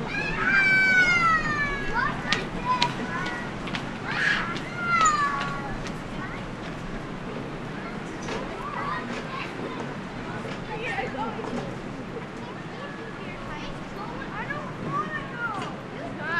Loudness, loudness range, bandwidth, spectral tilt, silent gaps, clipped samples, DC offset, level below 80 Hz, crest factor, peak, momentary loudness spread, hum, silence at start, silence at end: -27 LUFS; 11 LU; 13 kHz; -4 dB/octave; none; under 0.1%; under 0.1%; -46 dBFS; 26 dB; -2 dBFS; 15 LU; none; 0 s; 0 s